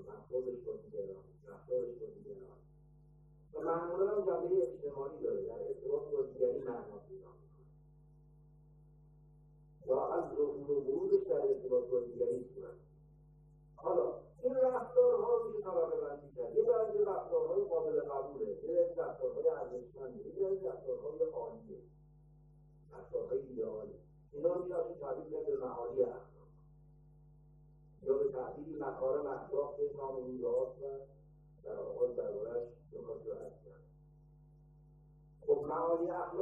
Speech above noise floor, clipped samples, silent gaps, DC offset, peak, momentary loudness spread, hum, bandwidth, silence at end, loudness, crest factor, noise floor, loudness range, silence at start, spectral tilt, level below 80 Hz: 26 dB; under 0.1%; none; under 0.1%; -18 dBFS; 17 LU; none; 2.5 kHz; 0 s; -37 LUFS; 20 dB; -62 dBFS; 9 LU; 0 s; -10 dB/octave; -68 dBFS